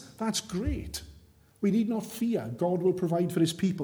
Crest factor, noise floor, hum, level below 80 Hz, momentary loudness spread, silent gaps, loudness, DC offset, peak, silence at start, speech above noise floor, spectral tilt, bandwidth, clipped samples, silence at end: 16 dB; -57 dBFS; none; -46 dBFS; 6 LU; none; -29 LUFS; under 0.1%; -14 dBFS; 0 s; 28 dB; -6 dB/octave; over 20 kHz; under 0.1%; 0 s